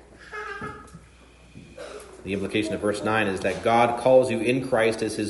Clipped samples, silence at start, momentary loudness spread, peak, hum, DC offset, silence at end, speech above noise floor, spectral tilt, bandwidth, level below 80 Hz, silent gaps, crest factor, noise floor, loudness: under 0.1%; 0.2 s; 21 LU; -6 dBFS; none; under 0.1%; 0 s; 29 dB; -5.5 dB/octave; 11.5 kHz; -54 dBFS; none; 18 dB; -51 dBFS; -23 LUFS